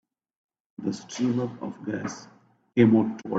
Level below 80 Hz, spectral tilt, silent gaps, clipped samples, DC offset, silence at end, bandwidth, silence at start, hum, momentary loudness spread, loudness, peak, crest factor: -68 dBFS; -7 dB/octave; none; under 0.1%; under 0.1%; 0 s; 8 kHz; 0.8 s; none; 15 LU; -26 LUFS; -6 dBFS; 22 dB